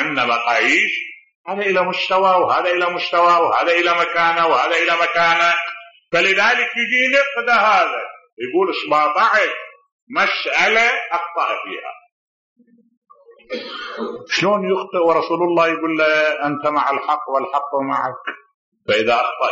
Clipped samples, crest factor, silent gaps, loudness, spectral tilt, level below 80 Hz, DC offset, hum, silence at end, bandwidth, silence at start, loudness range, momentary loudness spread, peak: under 0.1%; 14 dB; 1.35-1.45 s, 8.33-8.37 s, 9.92-10.07 s, 12.12-12.56 s, 12.97-13.02 s, 18.54-18.72 s; -16 LUFS; -0.5 dB/octave; -66 dBFS; under 0.1%; none; 0 s; 7.6 kHz; 0 s; 6 LU; 14 LU; -4 dBFS